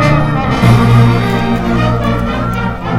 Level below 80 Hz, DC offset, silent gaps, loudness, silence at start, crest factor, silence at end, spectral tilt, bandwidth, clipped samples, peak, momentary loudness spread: -24 dBFS; under 0.1%; none; -11 LUFS; 0 s; 10 dB; 0 s; -7.5 dB/octave; 12.5 kHz; 0.3%; 0 dBFS; 8 LU